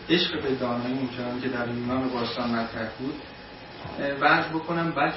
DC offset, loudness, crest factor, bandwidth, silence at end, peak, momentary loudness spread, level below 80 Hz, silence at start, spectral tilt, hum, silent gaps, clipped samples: under 0.1%; -27 LUFS; 20 dB; 5.8 kHz; 0 s; -8 dBFS; 16 LU; -54 dBFS; 0 s; -8.5 dB/octave; none; none; under 0.1%